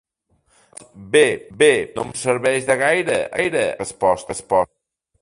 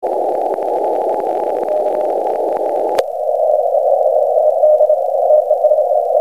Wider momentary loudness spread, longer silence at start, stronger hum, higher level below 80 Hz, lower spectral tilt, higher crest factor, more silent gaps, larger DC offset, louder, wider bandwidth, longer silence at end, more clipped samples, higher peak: about the same, 8 LU vs 6 LU; first, 0.95 s vs 0 s; neither; first, -54 dBFS vs -68 dBFS; second, -3.5 dB/octave vs -5 dB/octave; first, 20 dB vs 12 dB; neither; second, under 0.1% vs 0.5%; second, -19 LUFS vs -15 LUFS; second, 11.5 kHz vs 14.5 kHz; first, 0.55 s vs 0 s; neither; about the same, 0 dBFS vs -2 dBFS